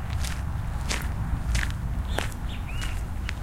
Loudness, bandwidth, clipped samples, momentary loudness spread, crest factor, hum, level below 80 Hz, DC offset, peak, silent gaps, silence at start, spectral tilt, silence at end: -31 LUFS; 16.5 kHz; under 0.1%; 4 LU; 24 dB; none; -30 dBFS; under 0.1%; -4 dBFS; none; 0 s; -4.5 dB/octave; 0 s